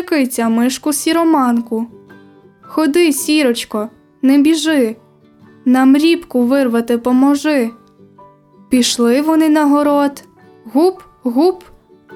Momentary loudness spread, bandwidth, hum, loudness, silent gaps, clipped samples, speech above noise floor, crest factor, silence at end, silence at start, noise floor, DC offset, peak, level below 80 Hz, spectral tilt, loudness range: 11 LU; 17 kHz; none; -14 LUFS; none; under 0.1%; 33 dB; 12 dB; 0 s; 0 s; -45 dBFS; under 0.1%; -2 dBFS; -56 dBFS; -3.5 dB/octave; 2 LU